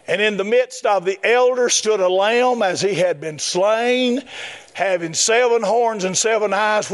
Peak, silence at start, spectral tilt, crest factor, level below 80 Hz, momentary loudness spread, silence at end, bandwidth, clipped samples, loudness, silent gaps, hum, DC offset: -4 dBFS; 0.1 s; -2.5 dB/octave; 14 dB; -72 dBFS; 6 LU; 0 s; 11.5 kHz; under 0.1%; -17 LUFS; none; none; under 0.1%